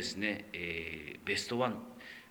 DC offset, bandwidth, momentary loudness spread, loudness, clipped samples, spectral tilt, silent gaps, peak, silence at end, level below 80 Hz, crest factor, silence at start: under 0.1%; over 20 kHz; 11 LU; -37 LUFS; under 0.1%; -3.5 dB/octave; none; -18 dBFS; 0 s; -64 dBFS; 20 dB; 0 s